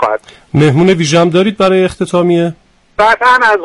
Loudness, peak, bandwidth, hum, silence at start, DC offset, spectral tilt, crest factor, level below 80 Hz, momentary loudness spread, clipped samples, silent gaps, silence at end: -10 LUFS; 0 dBFS; 11.5 kHz; none; 0 s; under 0.1%; -5.5 dB/octave; 10 dB; -42 dBFS; 9 LU; under 0.1%; none; 0 s